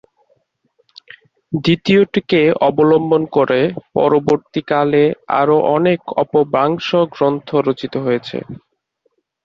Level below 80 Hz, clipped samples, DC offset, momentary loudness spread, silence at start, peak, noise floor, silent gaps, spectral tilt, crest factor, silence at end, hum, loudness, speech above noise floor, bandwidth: -54 dBFS; under 0.1%; under 0.1%; 6 LU; 1.5 s; -2 dBFS; -66 dBFS; none; -7.5 dB/octave; 14 dB; 0.9 s; none; -15 LUFS; 51 dB; 7.2 kHz